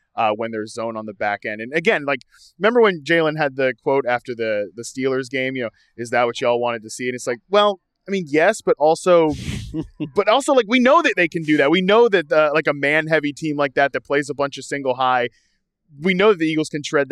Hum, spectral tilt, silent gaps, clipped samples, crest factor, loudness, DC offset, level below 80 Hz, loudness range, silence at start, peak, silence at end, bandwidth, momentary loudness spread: none; -5 dB/octave; none; under 0.1%; 16 dB; -19 LUFS; under 0.1%; -52 dBFS; 5 LU; 0.15 s; -4 dBFS; 0 s; 12.5 kHz; 12 LU